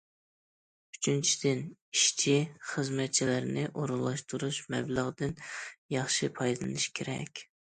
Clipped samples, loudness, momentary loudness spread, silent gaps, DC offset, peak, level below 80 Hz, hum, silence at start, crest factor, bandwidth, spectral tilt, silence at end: under 0.1%; -31 LUFS; 11 LU; 1.82-1.92 s, 5.78-5.89 s; under 0.1%; -14 dBFS; -66 dBFS; none; 0.95 s; 20 dB; 9.6 kHz; -3.5 dB/octave; 0.3 s